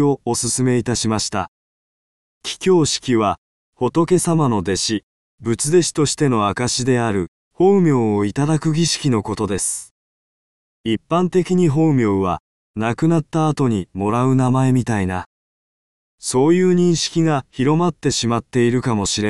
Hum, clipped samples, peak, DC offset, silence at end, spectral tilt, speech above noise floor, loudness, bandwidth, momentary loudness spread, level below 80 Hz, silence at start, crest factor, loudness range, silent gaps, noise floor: none; under 0.1%; -4 dBFS; 0.5%; 0 s; -5 dB/octave; over 73 dB; -18 LUFS; 12.5 kHz; 9 LU; -48 dBFS; 0 s; 14 dB; 3 LU; 1.48-2.41 s, 3.38-3.73 s, 5.03-5.38 s, 7.28-7.51 s, 9.91-10.84 s, 12.40-12.74 s, 15.26-16.18 s; under -90 dBFS